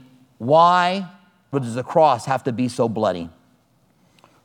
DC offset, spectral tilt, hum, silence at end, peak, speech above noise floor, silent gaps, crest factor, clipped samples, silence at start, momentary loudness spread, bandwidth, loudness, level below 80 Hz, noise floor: under 0.1%; -6 dB/octave; none; 1.15 s; -2 dBFS; 42 dB; none; 18 dB; under 0.1%; 0.4 s; 16 LU; 12.5 kHz; -19 LUFS; -64 dBFS; -60 dBFS